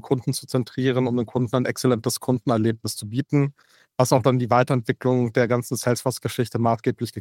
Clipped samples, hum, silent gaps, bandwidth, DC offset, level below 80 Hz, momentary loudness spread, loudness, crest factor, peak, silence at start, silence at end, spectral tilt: under 0.1%; none; none; 17 kHz; under 0.1%; -62 dBFS; 7 LU; -23 LUFS; 18 dB; -4 dBFS; 0.05 s; 0 s; -6 dB/octave